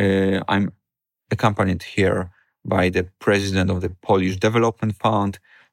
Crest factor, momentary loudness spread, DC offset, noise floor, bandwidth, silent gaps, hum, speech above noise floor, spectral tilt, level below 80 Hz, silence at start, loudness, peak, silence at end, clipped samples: 18 dB; 8 LU; under 0.1%; -75 dBFS; 15 kHz; none; none; 55 dB; -6.5 dB/octave; -54 dBFS; 0 s; -21 LUFS; -2 dBFS; 0.35 s; under 0.1%